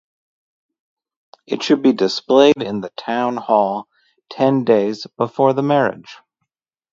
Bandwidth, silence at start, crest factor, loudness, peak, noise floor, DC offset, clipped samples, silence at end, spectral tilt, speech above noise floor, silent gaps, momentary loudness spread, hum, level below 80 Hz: 7.6 kHz; 1.5 s; 18 dB; -17 LUFS; 0 dBFS; -77 dBFS; under 0.1%; under 0.1%; 0.8 s; -6 dB/octave; 61 dB; none; 12 LU; none; -64 dBFS